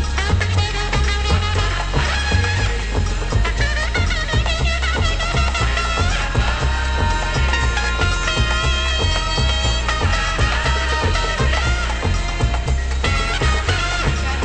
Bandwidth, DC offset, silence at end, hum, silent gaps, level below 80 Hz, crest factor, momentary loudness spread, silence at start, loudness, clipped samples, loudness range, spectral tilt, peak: 8.8 kHz; under 0.1%; 0 s; none; none; -20 dBFS; 14 dB; 2 LU; 0 s; -19 LUFS; under 0.1%; 1 LU; -4 dB/octave; -4 dBFS